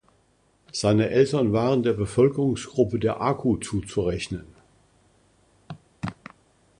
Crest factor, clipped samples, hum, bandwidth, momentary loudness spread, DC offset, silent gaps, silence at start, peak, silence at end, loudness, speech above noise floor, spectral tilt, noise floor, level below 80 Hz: 18 dB; under 0.1%; none; 11 kHz; 15 LU; under 0.1%; none; 0.75 s; -6 dBFS; 0.65 s; -24 LUFS; 41 dB; -6.5 dB/octave; -64 dBFS; -48 dBFS